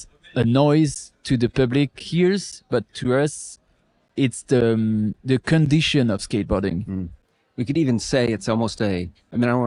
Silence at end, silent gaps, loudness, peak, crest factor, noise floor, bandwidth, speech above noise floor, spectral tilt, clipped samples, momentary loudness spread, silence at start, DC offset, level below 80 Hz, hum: 0 s; none; -21 LUFS; -4 dBFS; 18 dB; -63 dBFS; 11.5 kHz; 43 dB; -6 dB/octave; under 0.1%; 12 LU; 0 s; under 0.1%; -46 dBFS; none